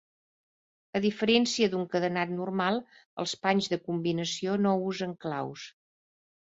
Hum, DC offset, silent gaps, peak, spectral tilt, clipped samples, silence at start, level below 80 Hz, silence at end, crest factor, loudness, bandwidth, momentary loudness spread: none; under 0.1%; 3.05-3.17 s; -10 dBFS; -5 dB/octave; under 0.1%; 0.95 s; -70 dBFS; 0.8 s; 20 dB; -29 LUFS; 8 kHz; 11 LU